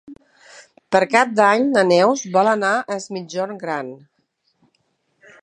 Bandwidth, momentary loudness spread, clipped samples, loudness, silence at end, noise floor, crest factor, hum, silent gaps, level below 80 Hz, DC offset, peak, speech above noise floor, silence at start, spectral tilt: 10 kHz; 12 LU; under 0.1%; -18 LUFS; 1.45 s; -68 dBFS; 20 dB; none; none; -70 dBFS; under 0.1%; 0 dBFS; 50 dB; 0.1 s; -4.5 dB/octave